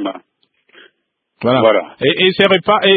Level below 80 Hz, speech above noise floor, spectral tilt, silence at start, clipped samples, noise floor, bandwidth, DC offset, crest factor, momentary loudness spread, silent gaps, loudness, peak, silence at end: -58 dBFS; 56 dB; -7 dB/octave; 0 s; under 0.1%; -68 dBFS; 4.8 kHz; under 0.1%; 14 dB; 12 LU; none; -13 LUFS; 0 dBFS; 0 s